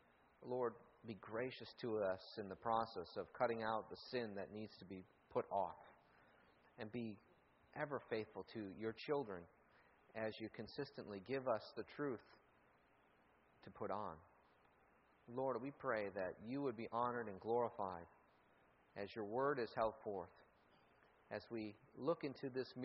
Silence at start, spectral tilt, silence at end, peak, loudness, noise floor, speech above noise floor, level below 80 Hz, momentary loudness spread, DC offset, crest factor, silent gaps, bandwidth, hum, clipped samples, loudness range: 0.4 s; -4.5 dB/octave; 0 s; -26 dBFS; -46 LUFS; -74 dBFS; 29 dB; -80 dBFS; 14 LU; under 0.1%; 22 dB; none; 5.8 kHz; none; under 0.1%; 5 LU